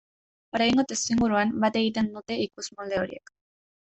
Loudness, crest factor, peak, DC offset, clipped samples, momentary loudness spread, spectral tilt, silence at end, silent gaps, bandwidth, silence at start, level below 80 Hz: -26 LUFS; 16 dB; -10 dBFS; under 0.1%; under 0.1%; 11 LU; -4 dB/octave; 0.6 s; none; 8.4 kHz; 0.55 s; -58 dBFS